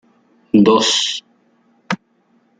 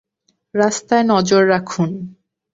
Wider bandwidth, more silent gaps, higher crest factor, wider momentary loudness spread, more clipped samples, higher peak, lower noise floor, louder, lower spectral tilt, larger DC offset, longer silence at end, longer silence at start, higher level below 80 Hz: first, 9.4 kHz vs 8 kHz; neither; about the same, 16 dB vs 16 dB; about the same, 14 LU vs 13 LU; neither; about the same, -2 dBFS vs -2 dBFS; second, -59 dBFS vs -66 dBFS; about the same, -15 LUFS vs -16 LUFS; second, -3.5 dB/octave vs -5 dB/octave; neither; first, 0.65 s vs 0.4 s; about the same, 0.55 s vs 0.55 s; about the same, -58 dBFS vs -58 dBFS